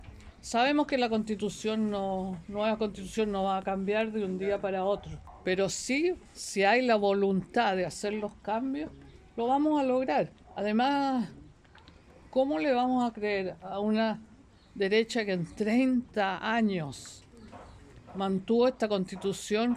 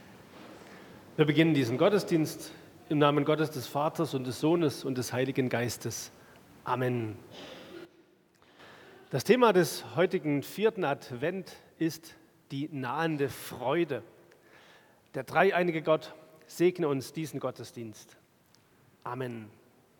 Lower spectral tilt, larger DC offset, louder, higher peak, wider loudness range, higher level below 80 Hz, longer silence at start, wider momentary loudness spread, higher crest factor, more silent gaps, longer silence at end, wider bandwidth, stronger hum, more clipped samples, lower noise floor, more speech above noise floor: about the same, -5 dB/octave vs -5.5 dB/octave; neither; about the same, -29 LUFS vs -30 LUFS; second, -12 dBFS vs -8 dBFS; second, 3 LU vs 7 LU; first, -58 dBFS vs -74 dBFS; about the same, 0 s vs 0.05 s; second, 11 LU vs 21 LU; about the same, 18 dB vs 22 dB; neither; second, 0 s vs 0.5 s; second, 13.5 kHz vs 19 kHz; neither; neither; second, -56 dBFS vs -64 dBFS; second, 27 dB vs 35 dB